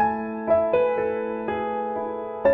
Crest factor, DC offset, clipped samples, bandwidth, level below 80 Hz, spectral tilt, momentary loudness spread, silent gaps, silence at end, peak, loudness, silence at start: 16 dB; under 0.1%; under 0.1%; 4.3 kHz; -56 dBFS; -9 dB/octave; 8 LU; none; 0 s; -8 dBFS; -25 LUFS; 0 s